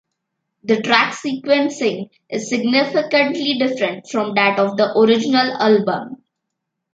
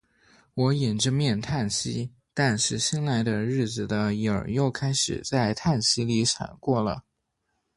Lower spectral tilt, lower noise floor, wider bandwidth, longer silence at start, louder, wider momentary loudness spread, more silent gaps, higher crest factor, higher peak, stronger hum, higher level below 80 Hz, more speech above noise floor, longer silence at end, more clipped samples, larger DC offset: about the same, -4.5 dB/octave vs -4.5 dB/octave; about the same, -78 dBFS vs -77 dBFS; second, 9 kHz vs 11.5 kHz; about the same, 0.65 s vs 0.55 s; first, -17 LUFS vs -26 LUFS; first, 10 LU vs 5 LU; neither; about the same, 16 dB vs 18 dB; first, -2 dBFS vs -8 dBFS; neither; second, -68 dBFS vs -52 dBFS; first, 61 dB vs 52 dB; about the same, 0.8 s vs 0.75 s; neither; neither